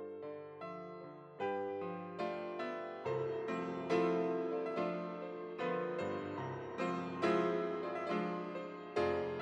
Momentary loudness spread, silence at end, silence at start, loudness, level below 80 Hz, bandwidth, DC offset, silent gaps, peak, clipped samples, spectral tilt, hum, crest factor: 12 LU; 0 s; 0 s; -39 LUFS; -82 dBFS; 9.2 kHz; under 0.1%; none; -20 dBFS; under 0.1%; -7 dB/octave; none; 18 dB